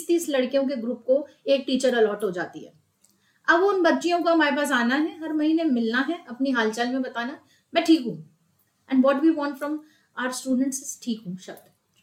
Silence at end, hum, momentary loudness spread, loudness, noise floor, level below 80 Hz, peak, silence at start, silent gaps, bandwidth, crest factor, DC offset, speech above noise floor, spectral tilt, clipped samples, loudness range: 0.5 s; none; 13 LU; -24 LUFS; -67 dBFS; -74 dBFS; -6 dBFS; 0 s; none; 16 kHz; 20 dB; under 0.1%; 44 dB; -3.5 dB/octave; under 0.1%; 4 LU